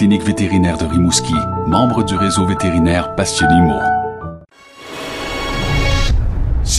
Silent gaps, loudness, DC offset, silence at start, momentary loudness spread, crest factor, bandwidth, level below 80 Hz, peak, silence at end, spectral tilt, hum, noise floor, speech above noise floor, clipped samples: none; -15 LUFS; under 0.1%; 0 s; 12 LU; 14 dB; 15.5 kHz; -24 dBFS; 0 dBFS; 0 s; -5 dB/octave; none; -39 dBFS; 25 dB; under 0.1%